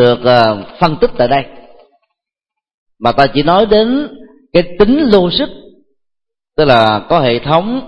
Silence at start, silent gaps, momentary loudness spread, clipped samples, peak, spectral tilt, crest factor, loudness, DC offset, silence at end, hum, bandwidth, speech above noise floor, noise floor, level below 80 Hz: 0 s; 2.74-2.86 s; 8 LU; 0.1%; 0 dBFS; -7.5 dB/octave; 12 dB; -11 LUFS; under 0.1%; 0 s; none; 8.8 kHz; 71 dB; -81 dBFS; -36 dBFS